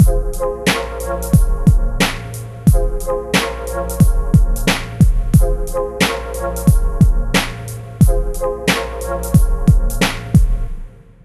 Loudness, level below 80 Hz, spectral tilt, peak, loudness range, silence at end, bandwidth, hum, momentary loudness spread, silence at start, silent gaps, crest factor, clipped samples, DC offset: -17 LUFS; -18 dBFS; -5.5 dB/octave; 0 dBFS; 1 LU; 0.35 s; 14 kHz; none; 8 LU; 0 s; none; 14 dB; under 0.1%; under 0.1%